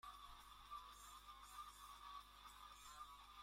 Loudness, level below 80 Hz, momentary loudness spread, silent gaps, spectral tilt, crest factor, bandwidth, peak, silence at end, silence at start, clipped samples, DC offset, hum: -59 LUFS; -72 dBFS; 3 LU; none; -1 dB/octave; 16 dB; 16.5 kHz; -44 dBFS; 0 s; 0.05 s; under 0.1%; under 0.1%; 50 Hz at -70 dBFS